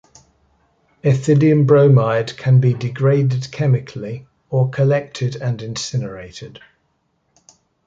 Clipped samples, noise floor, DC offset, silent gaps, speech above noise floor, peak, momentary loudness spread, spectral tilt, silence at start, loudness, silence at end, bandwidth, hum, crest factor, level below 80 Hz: under 0.1%; -66 dBFS; under 0.1%; none; 50 dB; -2 dBFS; 18 LU; -7.5 dB/octave; 1.05 s; -17 LUFS; 1.4 s; 7.8 kHz; none; 16 dB; -54 dBFS